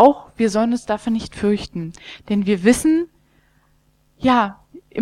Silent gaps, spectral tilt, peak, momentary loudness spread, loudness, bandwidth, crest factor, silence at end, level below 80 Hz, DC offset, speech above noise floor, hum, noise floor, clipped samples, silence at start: none; -5.5 dB/octave; 0 dBFS; 15 LU; -19 LUFS; 13.5 kHz; 20 dB; 0 s; -46 dBFS; under 0.1%; 41 dB; none; -59 dBFS; under 0.1%; 0 s